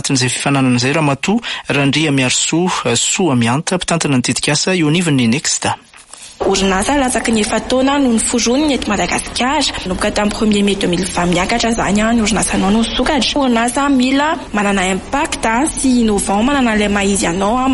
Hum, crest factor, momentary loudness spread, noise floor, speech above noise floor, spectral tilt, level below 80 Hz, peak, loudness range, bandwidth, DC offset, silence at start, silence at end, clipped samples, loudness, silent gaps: none; 12 dB; 4 LU; -37 dBFS; 22 dB; -4 dB/octave; -34 dBFS; -2 dBFS; 1 LU; 11.5 kHz; under 0.1%; 0.05 s; 0 s; under 0.1%; -14 LUFS; none